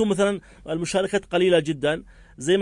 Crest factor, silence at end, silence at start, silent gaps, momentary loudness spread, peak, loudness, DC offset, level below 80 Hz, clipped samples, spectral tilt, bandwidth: 16 dB; 0 s; 0 s; none; 12 LU; -8 dBFS; -24 LUFS; under 0.1%; -52 dBFS; under 0.1%; -5 dB/octave; 11 kHz